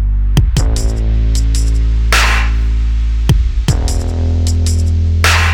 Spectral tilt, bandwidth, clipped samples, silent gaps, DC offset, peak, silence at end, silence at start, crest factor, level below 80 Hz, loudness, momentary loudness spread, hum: -4.5 dB/octave; 16 kHz; under 0.1%; none; under 0.1%; 0 dBFS; 0 s; 0 s; 12 dB; -12 dBFS; -14 LUFS; 5 LU; none